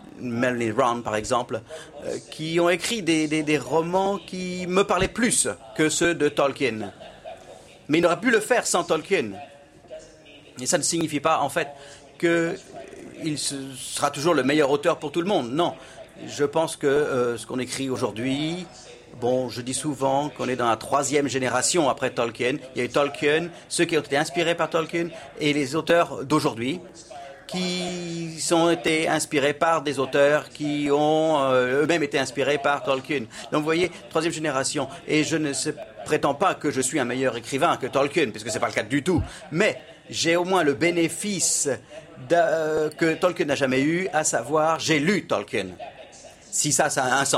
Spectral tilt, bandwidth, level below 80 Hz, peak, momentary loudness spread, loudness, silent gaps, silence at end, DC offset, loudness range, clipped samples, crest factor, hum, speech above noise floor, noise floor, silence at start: -3.5 dB/octave; 15.5 kHz; -56 dBFS; -6 dBFS; 12 LU; -23 LUFS; none; 0 s; under 0.1%; 4 LU; under 0.1%; 18 dB; none; 25 dB; -48 dBFS; 0 s